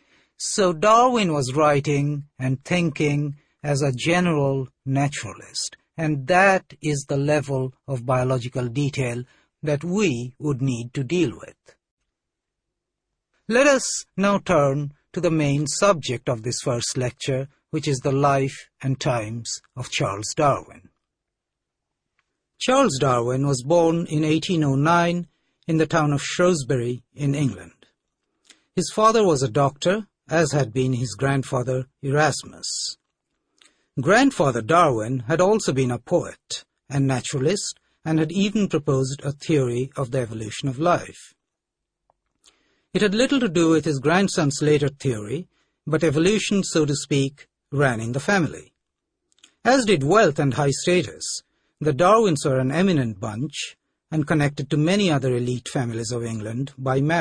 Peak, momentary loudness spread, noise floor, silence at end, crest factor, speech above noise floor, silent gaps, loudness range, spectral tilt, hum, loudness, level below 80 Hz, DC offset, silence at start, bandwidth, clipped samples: -4 dBFS; 11 LU; -83 dBFS; 0 s; 18 dB; 62 dB; 11.91-11.97 s; 5 LU; -5.5 dB/octave; none; -22 LUFS; -54 dBFS; under 0.1%; 0.4 s; 10.5 kHz; under 0.1%